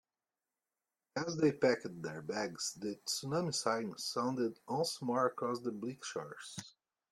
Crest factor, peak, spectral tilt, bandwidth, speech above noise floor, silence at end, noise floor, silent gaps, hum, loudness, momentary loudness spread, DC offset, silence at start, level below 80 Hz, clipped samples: 20 dB; -18 dBFS; -4 dB/octave; 14.5 kHz; over 53 dB; 0.45 s; under -90 dBFS; none; none; -37 LUFS; 11 LU; under 0.1%; 1.15 s; -78 dBFS; under 0.1%